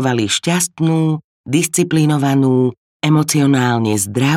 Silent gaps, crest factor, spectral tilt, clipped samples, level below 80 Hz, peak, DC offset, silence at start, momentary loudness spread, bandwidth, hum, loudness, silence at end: 1.24-1.44 s, 2.77-3.00 s; 14 dB; -5 dB/octave; under 0.1%; -58 dBFS; -2 dBFS; under 0.1%; 0 s; 6 LU; 16 kHz; none; -15 LUFS; 0 s